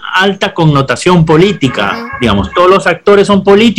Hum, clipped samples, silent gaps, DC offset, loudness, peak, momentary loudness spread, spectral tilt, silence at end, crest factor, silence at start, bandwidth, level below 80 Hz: none; 1%; none; under 0.1%; -9 LUFS; 0 dBFS; 5 LU; -6 dB/octave; 0 s; 8 dB; 0 s; 12 kHz; -32 dBFS